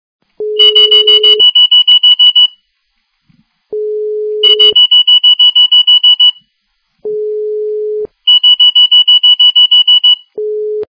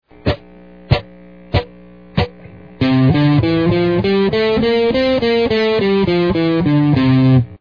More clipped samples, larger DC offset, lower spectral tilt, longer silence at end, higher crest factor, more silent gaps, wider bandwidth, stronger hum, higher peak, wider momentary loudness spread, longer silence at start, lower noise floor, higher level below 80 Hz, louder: first, 0.5% vs under 0.1%; second, under 0.1% vs 0.3%; second, -1 dB/octave vs -9 dB/octave; about the same, 0.05 s vs 0.05 s; second, 8 dB vs 14 dB; neither; about the same, 5.4 kHz vs 5.4 kHz; neither; about the same, 0 dBFS vs 0 dBFS; first, 15 LU vs 9 LU; first, 0.4 s vs 0.25 s; first, -63 dBFS vs -40 dBFS; second, -66 dBFS vs -34 dBFS; first, -3 LUFS vs -15 LUFS